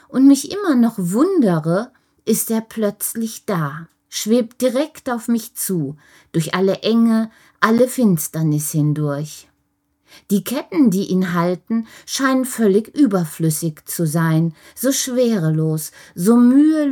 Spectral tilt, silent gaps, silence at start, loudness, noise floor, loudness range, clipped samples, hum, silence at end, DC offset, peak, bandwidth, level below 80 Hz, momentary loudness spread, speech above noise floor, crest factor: -5.5 dB/octave; none; 0.1 s; -18 LUFS; -67 dBFS; 3 LU; under 0.1%; none; 0 s; under 0.1%; 0 dBFS; 19.5 kHz; -64 dBFS; 10 LU; 50 dB; 18 dB